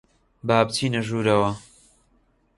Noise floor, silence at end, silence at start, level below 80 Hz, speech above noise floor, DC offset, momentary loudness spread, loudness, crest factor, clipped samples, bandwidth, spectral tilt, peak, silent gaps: -63 dBFS; 0.95 s; 0.45 s; -54 dBFS; 42 dB; under 0.1%; 10 LU; -22 LUFS; 22 dB; under 0.1%; 11.5 kHz; -5.5 dB/octave; -2 dBFS; none